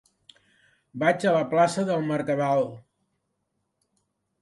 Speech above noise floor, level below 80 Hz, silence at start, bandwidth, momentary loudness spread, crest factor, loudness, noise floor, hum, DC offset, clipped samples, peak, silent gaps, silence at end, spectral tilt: 54 dB; -72 dBFS; 0.95 s; 11.5 kHz; 5 LU; 20 dB; -24 LUFS; -77 dBFS; none; under 0.1%; under 0.1%; -6 dBFS; none; 1.6 s; -6 dB/octave